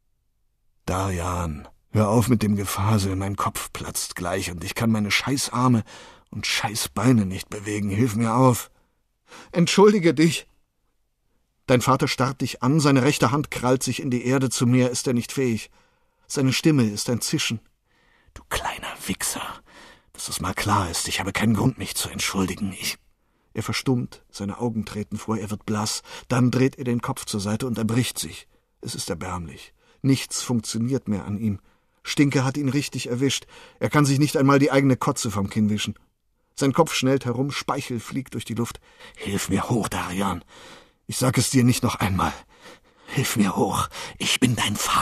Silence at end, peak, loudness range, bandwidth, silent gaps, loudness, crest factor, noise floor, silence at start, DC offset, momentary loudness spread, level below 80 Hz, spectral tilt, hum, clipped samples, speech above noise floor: 0 s; -4 dBFS; 6 LU; 14 kHz; none; -23 LUFS; 20 dB; -69 dBFS; 0.85 s; under 0.1%; 12 LU; -50 dBFS; -5 dB/octave; none; under 0.1%; 47 dB